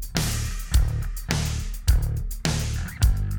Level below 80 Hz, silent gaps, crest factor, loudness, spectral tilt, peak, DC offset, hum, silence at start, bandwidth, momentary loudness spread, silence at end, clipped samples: -26 dBFS; none; 18 dB; -26 LUFS; -4.5 dB/octave; -6 dBFS; under 0.1%; none; 0 s; over 20 kHz; 5 LU; 0 s; under 0.1%